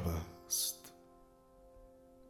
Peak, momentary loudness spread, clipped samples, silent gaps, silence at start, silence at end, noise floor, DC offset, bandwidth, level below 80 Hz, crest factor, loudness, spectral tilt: -24 dBFS; 26 LU; under 0.1%; none; 0 s; 0 s; -63 dBFS; under 0.1%; 19.5 kHz; -54 dBFS; 20 dB; -38 LUFS; -3 dB/octave